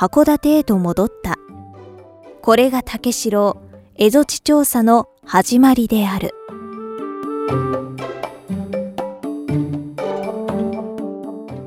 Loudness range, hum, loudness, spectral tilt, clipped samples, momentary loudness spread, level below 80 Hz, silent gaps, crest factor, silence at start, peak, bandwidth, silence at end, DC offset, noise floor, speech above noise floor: 9 LU; none; -18 LUFS; -5 dB/octave; under 0.1%; 15 LU; -46 dBFS; none; 18 dB; 0 s; 0 dBFS; 16.5 kHz; 0 s; under 0.1%; -41 dBFS; 26 dB